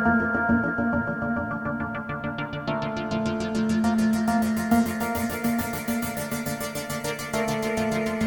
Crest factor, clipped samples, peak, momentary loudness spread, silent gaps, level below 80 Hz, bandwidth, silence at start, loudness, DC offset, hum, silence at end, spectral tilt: 18 dB; under 0.1%; -8 dBFS; 7 LU; none; -48 dBFS; over 20 kHz; 0 s; -26 LUFS; under 0.1%; none; 0 s; -5.5 dB/octave